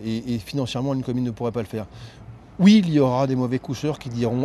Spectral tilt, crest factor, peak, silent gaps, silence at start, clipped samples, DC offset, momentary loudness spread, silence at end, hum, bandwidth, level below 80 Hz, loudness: -7 dB/octave; 18 dB; -4 dBFS; none; 0 s; under 0.1%; under 0.1%; 18 LU; 0 s; none; 12.5 kHz; -52 dBFS; -22 LUFS